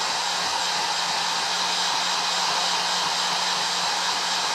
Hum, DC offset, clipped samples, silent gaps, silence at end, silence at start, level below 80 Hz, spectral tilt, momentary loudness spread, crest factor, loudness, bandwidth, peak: none; under 0.1%; under 0.1%; none; 0 s; 0 s; -70 dBFS; 0.5 dB/octave; 1 LU; 14 dB; -22 LUFS; 16 kHz; -10 dBFS